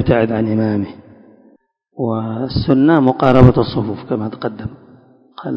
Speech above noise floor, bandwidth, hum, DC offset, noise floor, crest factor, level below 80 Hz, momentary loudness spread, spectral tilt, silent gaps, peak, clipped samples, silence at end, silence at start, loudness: 39 dB; 5.6 kHz; none; under 0.1%; -53 dBFS; 16 dB; -36 dBFS; 15 LU; -10 dB/octave; none; 0 dBFS; 0.3%; 0 s; 0 s; -15 LUFS